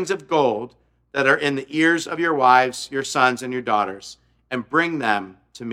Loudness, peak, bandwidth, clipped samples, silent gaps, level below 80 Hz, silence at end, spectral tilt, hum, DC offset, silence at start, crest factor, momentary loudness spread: -20 LUFS; 0 dBFS; 15 kHz; under 0.1%; none; -64 dBFS; 0 s; -4 dB/octave; none; under 0.1%; 0 s; 20 dB; 14 LU